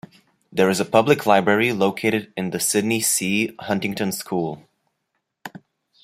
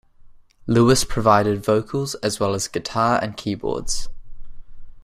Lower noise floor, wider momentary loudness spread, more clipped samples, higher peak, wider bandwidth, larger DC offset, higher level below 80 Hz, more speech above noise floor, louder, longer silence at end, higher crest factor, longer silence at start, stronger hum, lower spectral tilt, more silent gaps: first, -76 dBFS vs -46 dBFS; first, 16 LU vs 10 LU; neither; about the same, -2 dBFS vs -2 dBFS; about the same, 16 kHz vs 15.5 kHz; neither; second, -64 dBFS vs -38 dBFS; first, 56 dB vs 26 dB; about the same, -20 LUFS vs -20 LUFS; first, 0.55 s vs 0.05 s; about the same, 20 dB vs 20 dB; first, 0.55 s vs 0.25 s; neither; about the same, -4 dB/octave vs -5 dB/octave; neither